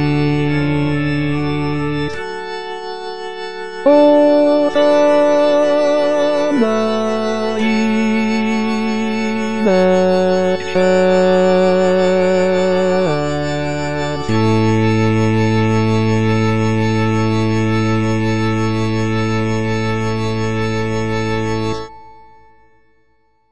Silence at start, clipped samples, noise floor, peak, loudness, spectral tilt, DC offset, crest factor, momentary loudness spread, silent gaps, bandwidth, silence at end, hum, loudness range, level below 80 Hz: 0 s; under 0.1%; -61 dBFS; 0 dBFS; -15 LUFS; -7 dB/octave; 3%; 14 dB; 8 LU; none; 10.5 kHz; 0 s; none; 6 LU; -42 dBFS